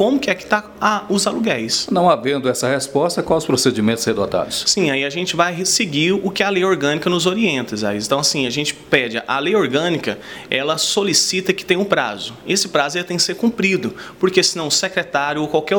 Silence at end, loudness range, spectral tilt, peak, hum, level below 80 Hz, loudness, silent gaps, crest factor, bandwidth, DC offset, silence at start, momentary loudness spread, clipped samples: 0 s; 1 LU; -3 dB/octave; 0 dBFS; none; -54 dBFS; -17 LUFS; none; 18 dB; 19 kHz; under 0.1%; 0 s; 5 LU; under 0.1%